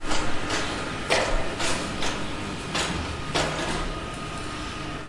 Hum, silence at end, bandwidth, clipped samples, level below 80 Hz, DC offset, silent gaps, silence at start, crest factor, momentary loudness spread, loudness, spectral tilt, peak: none; 0 s; 11.5 kHz; under 0.1%; -36 dBFS; under 0.1%; none; 0 s; 18 dB; 8 LU; -28 LUFS; -3.5 dB/octave; -8 dBFS